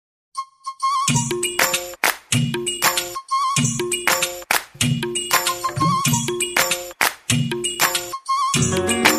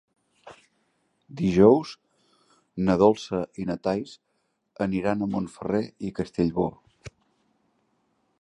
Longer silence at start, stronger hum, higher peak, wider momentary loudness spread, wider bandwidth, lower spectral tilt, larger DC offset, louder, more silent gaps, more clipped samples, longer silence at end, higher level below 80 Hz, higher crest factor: about the same, 0.35 s vs 0.45 s; neither; first, 0 dBFS vs -4 dBFS; second, 5 LU vs 14 LU; first, 15.5 kHz vs 10.5 kHz; second, -2.5 dB/octave vs -7.5 dB/octave; neither; first, -20 LUFS vs -25 LUFS; neither; neither; second, 0 s vs 1.3 s; about the same, -52 dBFS vs -54 dBFS; about the same, 20 dB vs 22 dB